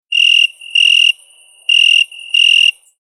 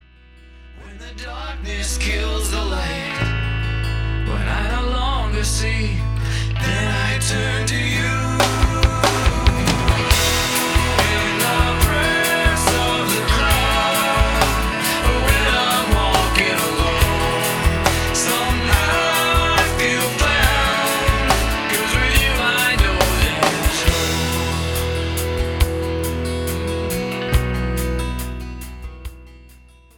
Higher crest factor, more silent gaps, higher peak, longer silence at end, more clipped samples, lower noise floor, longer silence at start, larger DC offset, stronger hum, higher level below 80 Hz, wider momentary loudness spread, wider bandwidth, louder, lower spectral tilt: second, 12 dB vs 18 dB; neither; about the same, -2 dBFS vs 0 dBFS; second, 0.3 s vs 0.45 s; neither; about the same, -45 dBFS vs -46 dBFS; second, 0.1 s vs 0.5 s; neither; neither; second, -88 dBFS vs -24 dBFS; about the same, 6 LU vs 7 LU; second, 12.5 kHz vs 19 kHz; first, -9 LUFS vs -18 LUFS; second, 11.5 dB/octave vs -3.5 dB/octave